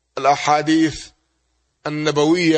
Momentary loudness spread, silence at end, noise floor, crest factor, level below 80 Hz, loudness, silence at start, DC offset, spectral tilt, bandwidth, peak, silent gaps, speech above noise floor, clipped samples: 13 LU; 0 s; -68 dBFS; 16 dB; -52 dBFS; -18 LUFS; 0.15 s; under 0.1%; -5 dB/octave; 8.8 kHz; -2 dBFS; none; 51 dB; under 0.1%